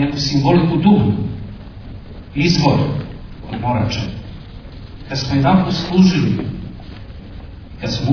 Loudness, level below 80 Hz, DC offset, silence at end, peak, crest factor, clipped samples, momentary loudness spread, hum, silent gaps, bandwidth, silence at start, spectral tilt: -16 LUFS; -36 dBFS; under 0.1%; 0 s; 0 dBFS; 16 dB; under 0.1%; 22 LU; none; none; 5.4 kHz; 0 s; -6.5 dB/octave